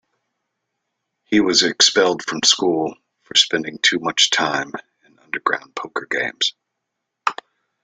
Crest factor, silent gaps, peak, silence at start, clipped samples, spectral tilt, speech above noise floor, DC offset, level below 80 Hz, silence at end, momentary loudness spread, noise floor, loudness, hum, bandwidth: 20 dB; none; 0 dBFS; 1.3 s; under 0.1%; -1.5 dB/octave; 60 dB; under 0.1%; -62 dBFS; 0.5 s; 14 LU; -79 dBFS; -18 LUFS; none; 9.8 kHz